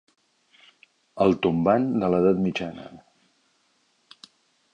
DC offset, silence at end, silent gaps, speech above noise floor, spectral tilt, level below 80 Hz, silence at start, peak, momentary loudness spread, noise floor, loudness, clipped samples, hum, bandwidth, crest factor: under 0.1%; 1.75 s; none; 45 dB; -8 dB/octave; -58 dBFS; 1.15 s; -6 dBFS; 21 LU; -67 dBFS; -23 LUFS; under 0.1%; none; 8.8 kHz; 20 dB